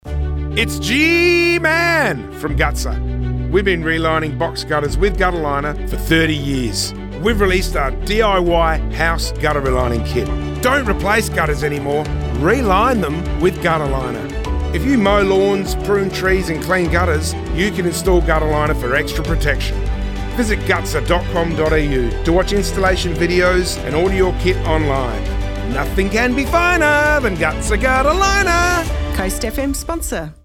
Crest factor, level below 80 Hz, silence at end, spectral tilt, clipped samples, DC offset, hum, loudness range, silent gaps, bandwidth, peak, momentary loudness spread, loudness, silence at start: 12 dB; -24 dBFS; 0.1 s; -5 dB/octave; under 0.1%; under 0.1%; none; 3 LU; none; 17.5 kHz; -4 dBFS; 8 LU; -17 LUFS; 0.05 s